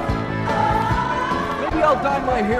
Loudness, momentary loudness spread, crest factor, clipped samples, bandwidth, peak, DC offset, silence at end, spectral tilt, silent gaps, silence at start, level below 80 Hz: -20 LUFS; 5 LU; 14 dB; under 0.1%; 14 kHz; -6 dBFS; under 0.1%; 0 s; -6.5 dB/octave; none; 0 s; -34 dBFS